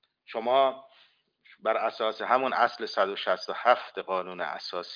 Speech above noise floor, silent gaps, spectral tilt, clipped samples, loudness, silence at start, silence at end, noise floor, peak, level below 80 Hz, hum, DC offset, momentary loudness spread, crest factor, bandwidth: 36 dB; none; -4 dB/octave; under 0.1%; -28 LUFS; 0.3 s; 0 s; -63 dBFS; -8 dBFS; -82 dBFS; none; under 0.1%; 10 LU; 22 dB; 5.2 kHz